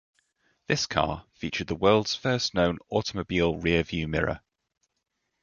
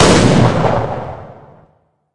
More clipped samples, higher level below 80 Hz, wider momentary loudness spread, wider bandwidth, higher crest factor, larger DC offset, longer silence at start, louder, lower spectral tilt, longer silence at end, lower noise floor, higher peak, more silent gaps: neither; second, -46 dBFS vs -34 dBFS; second, 9 LU vs 20 LU; second, 7.2 kHz vs 11.5 kHz; first, 22 dB vs 14 dB; neither; first, 0.7 s vs 0 s; second, -27 LUFS vs -13 LUFS; about the same, -5 dB/octave vs -5.5 dB/octave; first, 1.05 s vs 0 s; first, -80 dBFS vs -56 dBFS; second, -6 dBFS vs 0 dBFS; neither